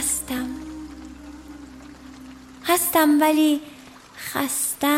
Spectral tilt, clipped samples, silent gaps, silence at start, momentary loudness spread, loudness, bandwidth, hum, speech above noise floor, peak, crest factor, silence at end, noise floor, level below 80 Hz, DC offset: -2 dB/octave; under 0.1%; none; 0 s; 25 LU; -21 LUFS; 16.5 kHz; none; 24 dB; -6 dBFS; 18 dB; 0 s; -43 dBFS; -50 dBFS; under 0.1%